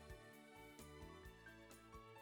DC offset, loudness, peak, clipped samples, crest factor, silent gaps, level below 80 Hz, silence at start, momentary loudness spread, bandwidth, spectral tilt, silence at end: under 0.1%; -60 LUFS; -46 dBFS; under 0.1%; 14 dB; none; -68 dBFS; 0 s; 3 LU; over 20 kHz; -4.5 dB/octave; 0 s